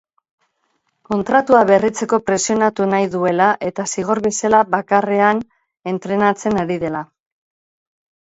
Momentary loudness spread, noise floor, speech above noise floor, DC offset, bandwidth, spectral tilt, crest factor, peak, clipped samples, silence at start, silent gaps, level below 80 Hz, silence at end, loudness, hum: 11 LU; -68 dBFS; 52 dB; under 0.1%; 8.2 kHz; -5 dB/octave; 18 dB; 0 dBFS; under 0.1%; 1.1 s; none; -56 dBFS; 1.25 s; -17 LUFS; none